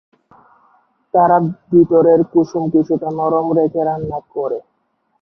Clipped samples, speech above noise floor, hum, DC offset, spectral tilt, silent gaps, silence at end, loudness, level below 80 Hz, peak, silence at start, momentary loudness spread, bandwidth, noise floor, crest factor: under 0.1%; 51 dB; none; under 0.1%; -10 dB/octave; none; 0.6 s; -15 LUFS; -52 dBFS; -2 dBFS; 1.15 s; 12 LU; 6.2 kHz; -66 dBFS; 14 dB